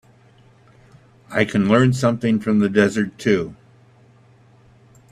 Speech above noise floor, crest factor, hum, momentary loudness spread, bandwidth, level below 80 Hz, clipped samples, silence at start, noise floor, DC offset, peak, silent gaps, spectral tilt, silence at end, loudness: 34 dB; 20 dB; none; 6 LU; 12.5 kHz; -56 dBFS; under 0.1%; 1.3 s; -51 dBFS; under 0.1%; 0 dBFS; none; -6.5 dB/octave; 1.6 s; -18 LUFS